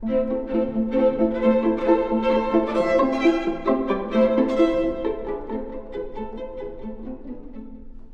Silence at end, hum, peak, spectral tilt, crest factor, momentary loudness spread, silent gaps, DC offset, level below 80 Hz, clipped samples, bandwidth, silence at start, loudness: 0 s; none; -6 dBFS; -7 dB/octave; 16 dB; 16 LU; none; under 0.1%; -40 dBFS; under 0.1%; 7.8 kHz; 0 s; -22 LUFS